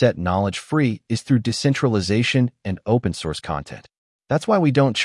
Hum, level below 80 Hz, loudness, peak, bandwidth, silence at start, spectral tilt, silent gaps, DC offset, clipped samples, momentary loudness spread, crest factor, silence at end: none; -50 dBFS; -21 LUFS; -4 dBFS; 12 kHz; 0 s; -6 dB/octave; 3.98-4.19 s; under 0.1%; under 0.1%; 10 LU; 16 dB; 0 s